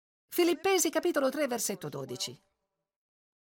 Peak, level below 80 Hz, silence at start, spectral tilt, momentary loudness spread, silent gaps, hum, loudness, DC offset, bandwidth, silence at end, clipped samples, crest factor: -14 dBFS; -76 dBFS; 0.3 s; -3 dB/octave; 11 LU; none; none; -30 LUFS; under 0.1%; 17 kHz; 1.1 s; under 0.1%; 18 dB